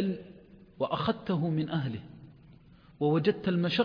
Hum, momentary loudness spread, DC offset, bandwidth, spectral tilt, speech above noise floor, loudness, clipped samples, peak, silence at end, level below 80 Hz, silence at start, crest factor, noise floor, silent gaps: none; 15 LU; under 0.1%; 5.2 kHz; -8.5 dB/octave; 27 dB; -30 LUFS; under 0.1%; -14 dBFS; 0 s; -62 dBFS; 0 s; 18 dB; -56 dBFS; none